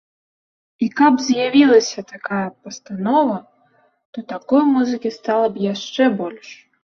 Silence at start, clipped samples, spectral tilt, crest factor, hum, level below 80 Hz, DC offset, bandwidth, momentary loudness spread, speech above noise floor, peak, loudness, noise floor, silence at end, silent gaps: 0.8 s; under 0.1%; -5 dB/octave; 16 dB; none; -66 dBFS; under 0.1%; 7.2 kHz; 17 LU; 41 dB; -2 dBFS; -18 LUFS; -59 dBFS; 0.3 s; 4.05-4.13 s